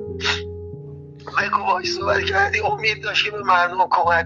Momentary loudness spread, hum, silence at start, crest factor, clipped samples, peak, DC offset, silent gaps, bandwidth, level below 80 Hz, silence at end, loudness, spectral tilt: 17 LU; none; 0 s; 16 dB; under 0.1%; -4 dBFS; under 0.1%; none; 7.6 kHz; -48 dBFS; 0 s; -19 LUFS; -3.5 dB/octave